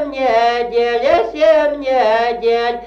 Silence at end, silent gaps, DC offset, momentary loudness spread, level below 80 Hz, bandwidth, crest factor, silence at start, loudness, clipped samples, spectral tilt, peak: 0 s; none; under 0.1%; 4 LU; -46 dBFS; 7.4 kHz; 12 dB; 0 s; -14 LUFS; under 0.1%; -4 dB/octave; -2 dBFS